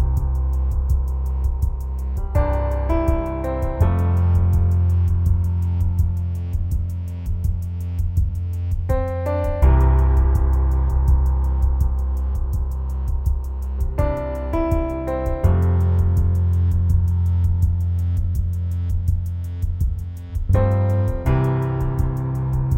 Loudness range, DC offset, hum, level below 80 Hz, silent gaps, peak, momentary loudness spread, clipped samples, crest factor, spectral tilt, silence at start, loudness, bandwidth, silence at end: 4 LU; under 0.1%; none; -22 dBFS; none; -4 dBFS; 7 LU; under 0.1%; 16 dB; -9.5 dB/octave; 0 s; -21 LUFS; 15.5 kHz; 0 s